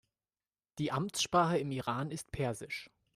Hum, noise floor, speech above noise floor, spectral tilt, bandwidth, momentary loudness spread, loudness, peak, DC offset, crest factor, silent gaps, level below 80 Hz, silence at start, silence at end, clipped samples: none; under -90 dBFS; over 56 dB; -4.5 dB/octave; 15.5 kHz; 13 LU; -35 LUFS; -16 dBFS; under 0.1%; 20 dB; none; -62 dBFS; 0.75 s; 0.3 s; under 0.1%